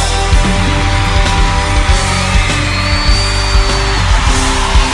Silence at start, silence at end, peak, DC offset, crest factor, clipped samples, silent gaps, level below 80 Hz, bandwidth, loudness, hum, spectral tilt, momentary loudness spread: 0 s; 0 s; 0 dBFS; under 0.1%; 10 dB; under 0.1%; none; -14 dBFS; 11.5 kHz; -12 LUFS; none; -4 dB/octave; 1 LU